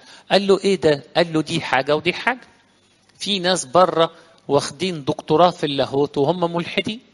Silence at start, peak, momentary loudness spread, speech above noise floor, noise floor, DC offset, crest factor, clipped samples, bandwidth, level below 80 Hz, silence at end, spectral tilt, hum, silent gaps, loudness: 0.1 s; 0 dBFS; 8 LU; 38 dB; -57 dBFS; under 0.1%; 20 dB; under 0.1%; 11.5 kHz; -58 dBFS; 0.15 s; -4.5 dB/octave; none; none; -19 LUFS